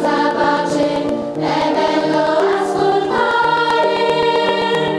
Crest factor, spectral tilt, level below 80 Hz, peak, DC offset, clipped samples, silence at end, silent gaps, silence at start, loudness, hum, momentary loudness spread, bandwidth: 12 dB; -5 dB/octave; -52 dBFS; -4 dBFS; under 0.1%; under 0.1%; 0 s; none; 0 s; -16 LUFS; none; 3 LU; 11 kHz